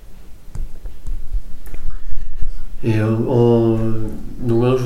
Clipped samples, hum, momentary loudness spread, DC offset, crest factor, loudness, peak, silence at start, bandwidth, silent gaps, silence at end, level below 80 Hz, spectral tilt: under 0.1%; none; 21 LU; under 0.1%; 12 dB; -18 LUFS; -2 dBFS; 0.05 s; 6 kHz; none; 0 s; -24 dBFS; -9 dB/octave